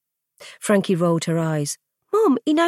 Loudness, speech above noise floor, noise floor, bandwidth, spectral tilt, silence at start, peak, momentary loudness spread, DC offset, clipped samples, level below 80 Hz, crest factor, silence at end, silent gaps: -21 LUFS; 28 dB; -47 dBFS; 15 kHz; -5.5 dB/octave; 0.4 s; -6 dBFS; 10 LU; under 0.1%; under 0.1%; -70 dBFS; 16 dB; 0 s; none